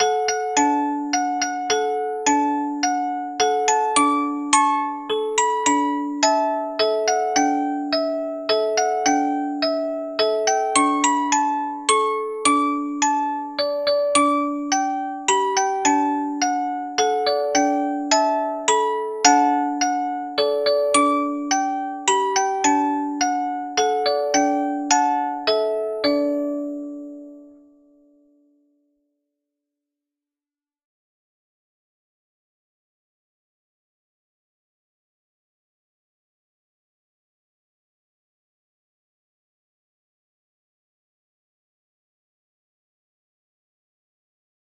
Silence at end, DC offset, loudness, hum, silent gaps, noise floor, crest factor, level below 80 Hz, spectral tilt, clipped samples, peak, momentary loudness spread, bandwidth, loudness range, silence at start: 17.25 s; under 0.1%; -20 LUFS; none; none; under -90 dBFS; 22 dB; -66 dBFS; -1 dB/octave; under 0.1%; -2 dBFS; 6 LU; 13 kHz; 2 LU; 0 s